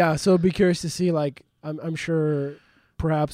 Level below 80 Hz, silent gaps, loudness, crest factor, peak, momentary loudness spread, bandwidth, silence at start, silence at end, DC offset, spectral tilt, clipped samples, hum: -46 dBFS; none; -24 LUFS; 14 dB; -8 dBFS; 13 LU; 15 kHz; 0 s; 0 s; under 0.1%; -6.5 dB/octave; under 0.1%; none